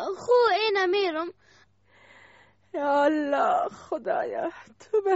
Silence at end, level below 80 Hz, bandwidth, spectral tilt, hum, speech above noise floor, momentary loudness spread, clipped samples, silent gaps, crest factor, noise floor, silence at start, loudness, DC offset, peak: 0 s; -72 dBFS; 8 kHz; -0.5 dB/octave; none; 35 dB; 12 LU; under 0.1%; none; 16 dB; -60 dBFS; 0 s; -25 LUFS; under 0.1%; -10 dBFS